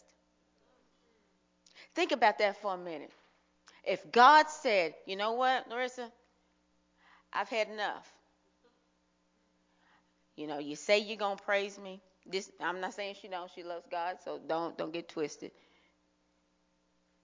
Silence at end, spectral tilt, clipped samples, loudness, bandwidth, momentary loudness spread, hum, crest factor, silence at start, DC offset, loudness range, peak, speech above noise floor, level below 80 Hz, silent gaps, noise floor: 1.75 s; -3 dB/octave; under 0.1%; -32 LUFS; 7.6 kHz; 17 LU; none; 26 dB; 1.75 s; under 0.1%; 12 LU; -10 dBFS; 42 dB; -84 dBFS; none; -74 dBFS